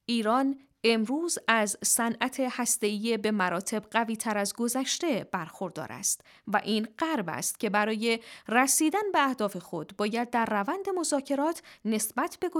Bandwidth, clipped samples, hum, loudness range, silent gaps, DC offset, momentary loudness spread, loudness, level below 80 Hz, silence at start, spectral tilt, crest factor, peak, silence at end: 18.5 kHz; under 0.1%; none; 3 LU; none; under 0.1%; 7 LU; -28 LUFS; -76 dBFS; 0.1 s; -2.5 dB/octave; 22 dB; -6 dBFS; 0 s